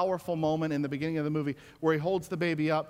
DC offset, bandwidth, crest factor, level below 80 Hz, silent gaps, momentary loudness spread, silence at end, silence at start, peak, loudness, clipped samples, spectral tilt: under 0.1%; 16 kHz; 16 dB; -64 dBFS; none; 4 LU; 0 s; 0 s; -14 dBFS; -30 LUFS; under 0.1%; -7 dB/octave